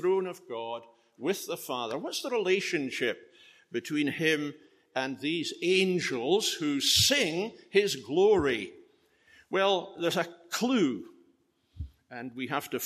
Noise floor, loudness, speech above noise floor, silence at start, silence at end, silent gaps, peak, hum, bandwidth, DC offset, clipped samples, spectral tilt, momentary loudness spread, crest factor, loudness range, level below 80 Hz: -69 dBFS; -29 LUFS; 40 dB; 0 s; 0 s; none; -10 dBFS; none; 14.5 kHz; under 0.1%; under 0.1%; -3.5 dB/octave; 15 LU; 20 dB; 6 LU; -60 dBFS